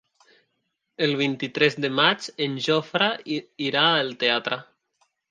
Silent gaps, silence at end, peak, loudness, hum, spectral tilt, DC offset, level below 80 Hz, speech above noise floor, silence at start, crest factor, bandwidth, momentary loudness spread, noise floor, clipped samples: none; 0.65 s; -4 dBFS; -23 LUFS; none; -4.5 dB/octave; under 0.1%; -74 dBFS; 53 dB; 1 s; 22 dB; 9.6 kHz; 8 LU; -77 dBFS; under 0.1%